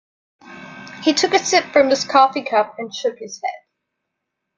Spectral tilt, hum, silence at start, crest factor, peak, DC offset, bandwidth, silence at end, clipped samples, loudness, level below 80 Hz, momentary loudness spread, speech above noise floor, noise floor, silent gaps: -2 dB/octave; none; 0.45 s; 18 dB; -2 dBFS; under 0.1%; 9.4 kHz; 1 s; under 0.1%; -18 LUFS; -66 dBFS; 20 LU; 61 dB; -78 dBFS; none